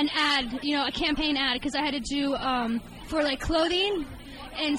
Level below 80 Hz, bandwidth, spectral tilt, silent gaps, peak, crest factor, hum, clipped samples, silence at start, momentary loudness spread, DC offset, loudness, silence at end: -44 dBFS; 16 kHz; -3.5 dB/octave; none; -12 dBFS; 16 dB; none; under 0.1%; 0 s; 9 LU; under 0.1%; -26 LUFS; 0 s